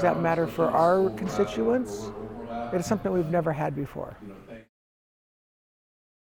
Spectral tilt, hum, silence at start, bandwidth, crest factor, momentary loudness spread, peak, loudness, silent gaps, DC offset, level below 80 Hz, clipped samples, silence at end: -7 dB/octave; none; 0 s; 19 kHz; 18 dB; 17 LU; -10 dBFS; -26 LUFS; none; under 0.1%; -54 dBFS; under 0.1%; 1.65 s